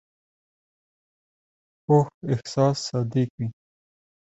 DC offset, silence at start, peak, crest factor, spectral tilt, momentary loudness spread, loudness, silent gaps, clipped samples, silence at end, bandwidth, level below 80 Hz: under 0.1%; 1.9 s; -6 dBFS; 22 dB; -7 dB/octave; 12 LU; -24 LUFS; 2.14-2.21 s, 3.30-3.38 s; under 0.1%; 0.7 s; 8.2 kHz; -62 dBFS